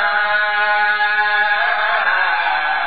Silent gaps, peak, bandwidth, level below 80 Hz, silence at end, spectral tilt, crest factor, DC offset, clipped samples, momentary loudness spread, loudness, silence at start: none; -4 dBFS; 5 kHz; -62 dBFS; 0 s; 4.5 dB/octave; 12 dB; 2%; under 0.1%; 1 LU; -15 LUFS; 0 s